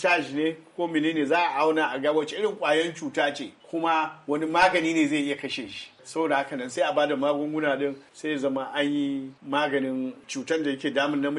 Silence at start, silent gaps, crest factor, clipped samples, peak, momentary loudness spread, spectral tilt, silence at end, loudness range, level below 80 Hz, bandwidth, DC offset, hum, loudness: 0 s; none; 16 dB; under 0.1%; -10 dBFS; 9 LU; -4.5 dB/octave; 0 s; 3 LU; -70 dBFS; 11.5 kHz; under 0.1%; none; -26 LUFS